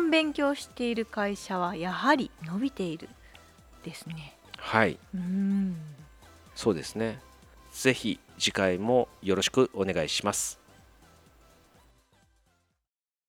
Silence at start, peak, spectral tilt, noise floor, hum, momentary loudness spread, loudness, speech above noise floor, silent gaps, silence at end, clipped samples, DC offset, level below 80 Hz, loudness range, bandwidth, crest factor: 0 s; -6 dBFS; -4 dB/octave; -89 dBFS; none; 17 LU; -29 LUFS; 61 dB; none; 2.75 s; under 0.1%; under 0.1%; -60 dBFS; 5 LU; 17 kHz; 26 dB